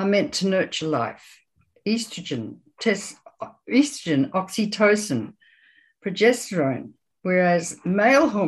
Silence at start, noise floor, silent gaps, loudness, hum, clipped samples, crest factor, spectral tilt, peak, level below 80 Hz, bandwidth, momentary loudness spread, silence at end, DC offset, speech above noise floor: 0 s; -58 dBFS; none; -23 LUFS; none; under 0.1%; 18 dB; -5 dB/octave; -4 dBFS; -66 dBFS; 12.5 kHz; 15 LU; 0 s; under 0.1%; 36 dB